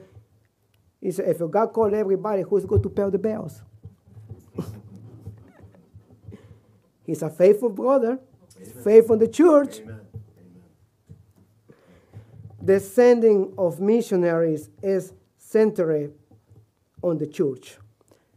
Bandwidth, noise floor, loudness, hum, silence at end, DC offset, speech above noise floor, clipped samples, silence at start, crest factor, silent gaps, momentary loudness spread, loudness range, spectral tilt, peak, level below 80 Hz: 15.5 kHz; -64 dBFS; -21 LUFS; none; 0.65 s; under 0.1%; 44 dB; under 0.1%; 1 s; 22 dB; none; 22 LU; 14 LU; -7.5 dB/octave; -2 dBFS; -56 dBFS